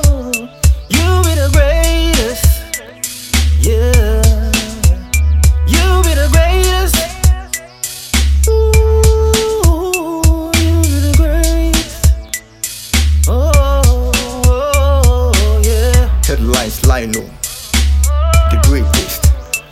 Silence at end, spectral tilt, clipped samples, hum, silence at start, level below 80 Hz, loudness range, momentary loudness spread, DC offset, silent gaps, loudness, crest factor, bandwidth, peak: 0.1 s; -4.5 dB/octave; under 0.1%; none; 0 s; -12 dBFS; 2 LU; 8 LU; under 0.1%; none; -13 LUFS; 10 dB; 16 kHz; 0 dBFS